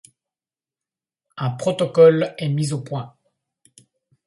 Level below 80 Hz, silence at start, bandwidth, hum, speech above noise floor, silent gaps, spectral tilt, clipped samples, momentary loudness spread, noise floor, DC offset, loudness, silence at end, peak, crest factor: -64 dBFS; 1.35 s; 11.5 kHz; none; over 72 dB; none; -6.5 dB/octave; under 0.1%; 17 LU; under -90 dBFS; under 0.1%; -19 LUFS; 1.2 s; -2 dBFS; 20 dB